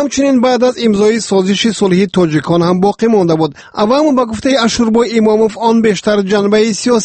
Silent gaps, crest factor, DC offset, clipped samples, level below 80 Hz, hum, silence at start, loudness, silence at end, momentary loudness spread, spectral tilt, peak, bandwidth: none; 10 dB; under 0.1%; under 0.1%; -44 dBFS; none; 0 s; -11 LUFS; 0 s; 3 LU; -5 dB/octave; 0 dBFS; 8.8 kHz